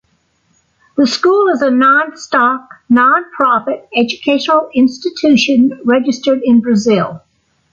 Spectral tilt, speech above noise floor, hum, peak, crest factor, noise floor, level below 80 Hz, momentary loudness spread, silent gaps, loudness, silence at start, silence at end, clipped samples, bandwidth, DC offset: -5 dB/octave; 47 dB; none; -2 dBFS; 12 dB; -59 dBFS; -58 dBFS; 6 LU; none; -12 LUFS; 0.95 s; 0.55 s; under 0.1%; 7.6 kHz; under 0.1%